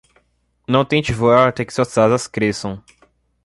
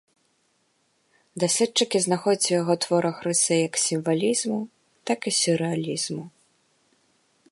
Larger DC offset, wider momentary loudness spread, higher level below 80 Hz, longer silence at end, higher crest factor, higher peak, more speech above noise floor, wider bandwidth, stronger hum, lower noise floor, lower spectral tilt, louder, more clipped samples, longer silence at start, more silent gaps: neither; first, 15 LU vs 9 LU; first, -46 dBFS vs -74 dBFS; second, 0.65 s vs 1.25 s; about the same, 16 dB vs 18 dB; first, -2 dBFS vs -8 dBFS; about the same, 46 dB vs 45 dB; about the same, 11.5 kHz vs 11.5 kHz; neither; second, -62 dBFS vs -69 dBFS; first, -5.5 dB/octave vs -3.5 dB/octave; first, -17 LUFS vs -23 LUFS; neither; second, 0.7 s vs 1.35 s; neither